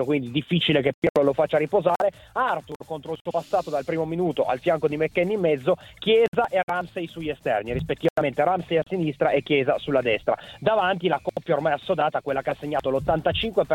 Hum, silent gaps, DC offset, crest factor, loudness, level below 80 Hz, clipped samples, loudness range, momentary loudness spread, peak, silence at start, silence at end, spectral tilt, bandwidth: none; 0.94-1.02 s, 1.10-1.15 s, 2.76-2.80 s, 3.21-3.25 s, 6.28-6.32 s, 6.63-6.68 s, 8.10-8.16 s; under 0.1%; 16 dB; -24 LUFS; -50 dBFS; under 0.1%; 2 LU; 6 LU; -8 dBFS; 0 s; 0 s; -6.5 dB/octave; 16.5 kHz